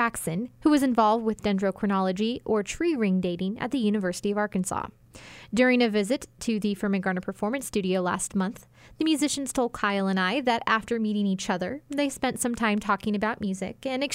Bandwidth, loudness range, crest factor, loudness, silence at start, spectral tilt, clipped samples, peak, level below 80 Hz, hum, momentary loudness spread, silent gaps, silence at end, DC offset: 16 kHz; 2 LU; 18 dB; -26 LUFS; 0 s; -5 dB/octave; under 0.1%; -8 dBFS; -56 dBFS; none; 8 LU; none; 0 s; under 0.1%